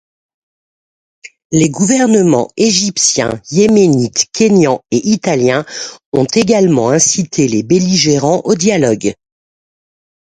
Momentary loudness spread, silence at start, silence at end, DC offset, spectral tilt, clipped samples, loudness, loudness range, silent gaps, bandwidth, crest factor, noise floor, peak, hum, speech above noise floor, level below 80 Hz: 6 LU; 1.25 s; 1.15 s; under 0.1%; -4.5 dB/octave; under 0.1%; -11 LUFS; 2 LU; 1.45-1.50 s, 6.06-6.12 s; 10.5 kHz; 12 dB; under -90 dBFS; 0 dBFS; none; over 79 dB; -50 dBFS